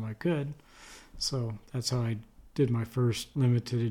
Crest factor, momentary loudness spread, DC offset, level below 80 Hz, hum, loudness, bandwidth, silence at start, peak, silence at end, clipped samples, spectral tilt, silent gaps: 16 dB; 16 LU; under 0.1%; -56 dBFS; none; -31 LUFS; 14 kHz; 0 s; -16 dBFS; 0 s; under 0.1%; -6 dB/octave; none